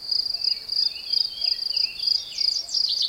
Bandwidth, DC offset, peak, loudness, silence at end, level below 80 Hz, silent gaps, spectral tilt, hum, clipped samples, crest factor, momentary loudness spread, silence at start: 16.5 kHz; under 0.1%; -10 dBFS; -22 LUFS; 0 s; -62 dBFS; none; 2 dB/octave; none; under 0.1%; 16 dB; 2 LU; 0 s